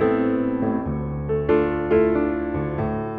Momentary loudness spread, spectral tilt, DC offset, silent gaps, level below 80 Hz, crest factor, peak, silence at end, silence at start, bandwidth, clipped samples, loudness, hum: 6 LU; -11 dB/octave; under 0.1%; none; -38 dBFS; 14 dB; -6 dBFS; 0 s; 0 s; 4.5 kHz; under 0.1%; -22 LUFS; none